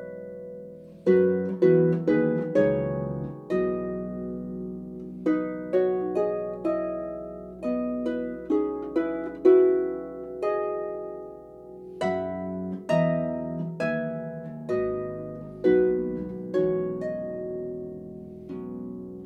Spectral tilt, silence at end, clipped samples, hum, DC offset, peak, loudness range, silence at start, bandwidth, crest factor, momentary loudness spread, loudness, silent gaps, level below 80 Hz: -9 dB/octave; 0 s; under 0.1%; none; under 0.1%; -8 dBFS; 5 LU; 0 s; 6.6 kHz; 18 dB; 17 LU; -27 LUFS; none; -56 dBFS